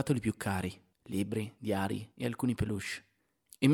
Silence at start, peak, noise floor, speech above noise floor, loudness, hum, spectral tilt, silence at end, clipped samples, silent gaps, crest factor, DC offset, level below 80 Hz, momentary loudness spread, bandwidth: 0 s; -12 dBFS; -63 dBFS; 29 dB; -35 LUFS; none; -6 dB/octave; 0 s; under 0.1%; none; 20 dB; under 0.1%; -58 dBFS; 8 LU; 18 kHz